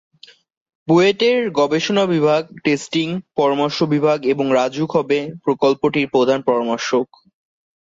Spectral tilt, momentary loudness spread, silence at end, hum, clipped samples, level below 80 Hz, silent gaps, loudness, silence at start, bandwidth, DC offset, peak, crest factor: -5.5 dB/octave; 6 LU; 0.8 s; none; under 0.1%; -62 dBFS; none; -18 LUFS; 0.85 s; 7.8 kHz; under 0.1%; -4 dBFS; 14 dB